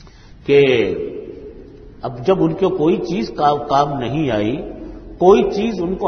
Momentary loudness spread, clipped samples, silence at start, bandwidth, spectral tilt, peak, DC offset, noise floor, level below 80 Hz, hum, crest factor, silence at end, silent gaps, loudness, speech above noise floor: 19 LU; under 0.1%; 0.05 s; 6.6 kHz; -7 dB/octave; 0 dBFS; under 0.1%; -38 dBFS; -42 dBFS; none; 18 dB; 0 s; none; -17 LUFS; 22 dB